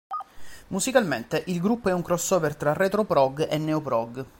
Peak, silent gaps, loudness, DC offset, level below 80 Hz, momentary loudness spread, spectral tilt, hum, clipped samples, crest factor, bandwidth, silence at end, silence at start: -6 dBFS; none; -25 LUFS; under 0.1%; -56 dBFS; 7 LU; -5 dB/octave; none; under 0.1%; 20 dB; 17 kHz; 0.1 s; 0.1 s